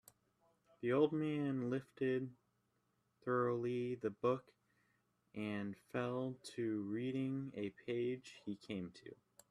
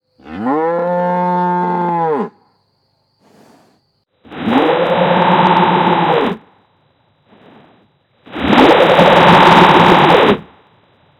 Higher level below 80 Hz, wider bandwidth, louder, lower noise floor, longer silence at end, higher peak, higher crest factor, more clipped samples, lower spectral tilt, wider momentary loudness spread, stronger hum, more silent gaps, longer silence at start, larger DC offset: second, -82 dBFS vs -46 dBFS; second, 13.5 kHz vs 15.5 kHz; second, -41 LUFS vs -11 LUFS; first, -82 dBFS vs -61 dBFS; second, 0.35 s vs 0.75 s; second, -22 dBFS vs 0 dBFS; first, 20 dB vs 14 dB; second, under 0.1% vs 0.5%; about the same, -7.5 dB/octave vs -6.5 dB/octave; about the same, 12 LU vs 14 LU; first, 60 Hz at -70 dBFS vs none; neither; first, 0.8 s vs 0.25 s; neither